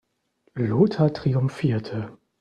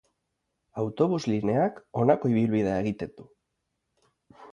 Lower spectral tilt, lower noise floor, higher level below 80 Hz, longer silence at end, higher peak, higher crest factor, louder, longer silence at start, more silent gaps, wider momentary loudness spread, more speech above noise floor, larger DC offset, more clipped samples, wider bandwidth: about the same, -9 dB/octave vs -8 dB/octave; second, -67 dBFS vs -80 dBFS; about the same, -56 dBFS vs -60 dBFS; first, 0.25 s vs 0 s; about the same, -6 dBFS vs -8 dBFS; about the same, 18 dB vs 20 dB; first, -23 LUFS vs -26 LUFS; second, 0.55 s vs 0.75 s; neither; first, 14 LU vs 11 LU; second, 45 dB vs 54 dB; neither; neither; first, 9.4 kHz vs 7.6 kHz